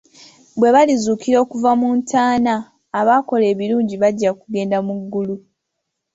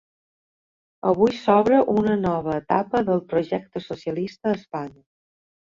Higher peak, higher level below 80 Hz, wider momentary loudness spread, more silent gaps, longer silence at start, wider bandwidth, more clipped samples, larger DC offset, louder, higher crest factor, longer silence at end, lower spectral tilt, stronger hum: about the same, -2 dBFS vs -4 dBFS; about the same, -60 dBFS vs -56 dBFS; about the same, 10 LU vs 12 LU; neither; second, 0.55 s vs 1.05 s; about the same, 8 kHz vs 7.4 kHz; neither; neither; first, -17 LUFS vs -22 LUFS; second, 14 dB vs 20 dB; second, 0.75 s vs 0.9 s; second, -5.5 dB/octave vs -8 dB/octave; neither